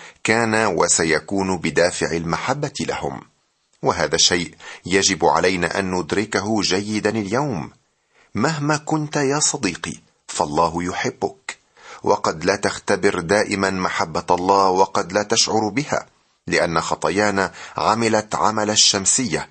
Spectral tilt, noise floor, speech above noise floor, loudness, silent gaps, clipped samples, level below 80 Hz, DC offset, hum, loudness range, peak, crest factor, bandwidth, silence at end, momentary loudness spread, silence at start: -3 dB/octave; -64 dBFS; 44 dB; -19 LUFS; none; under 0.1%; -52 dBFS; under 0.1%; none; 4 LU; -2 dBFS; 20 dB; 9 kHz; 0.05 s; 11 LU; 0 s